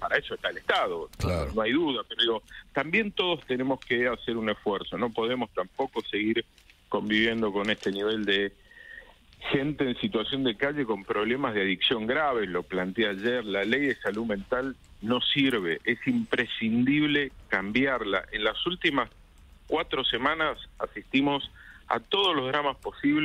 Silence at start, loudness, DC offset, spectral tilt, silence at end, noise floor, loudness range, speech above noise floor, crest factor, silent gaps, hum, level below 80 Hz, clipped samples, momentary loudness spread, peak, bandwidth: 0 s; -27 LUFS; under 0.1%; -5.5 dB/octave; 0 s; -53 dBFS; 3 LU; 25 dB; 20 dB; none; none; -52 dBFS; under 0.1%; 8 LU; -10 dBFS; 15 kHz